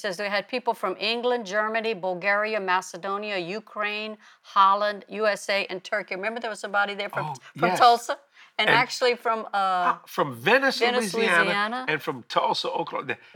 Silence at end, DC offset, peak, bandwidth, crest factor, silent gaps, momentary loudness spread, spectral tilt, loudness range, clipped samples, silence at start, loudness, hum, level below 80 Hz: 0.2 s; under 0.1%; -6 dBFS; 19.5 kHz; 20 dB; none; 10 LU; -3.5 dB/octave; 4 LU; under 0.1%; 0 s; -24 LUFS; none; -78 dBFS